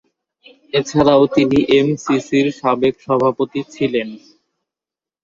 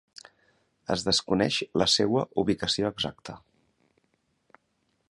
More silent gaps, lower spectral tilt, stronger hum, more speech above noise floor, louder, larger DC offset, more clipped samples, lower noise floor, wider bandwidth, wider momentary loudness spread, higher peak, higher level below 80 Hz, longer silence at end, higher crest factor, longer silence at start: neither; first, -6 dB/octave vs -4 dB/octave; neither; first, 73 dB vs 47 dB; first, -16 LUFS vs -26 LUFS; neither; neither; first, -89 dBFS vs -74 dBFS; second, 7.6 kHz vs 11.5 kHz; second, 9 LU vs 20 LU; first, -2 dBFS vs -8 dBFS; first, -50 dBFS vs -56 dBFS; second, 1.05 s vs 1.75 s; second, 16 dB vs 22 dB; second, 0.75 s vs 0.9 s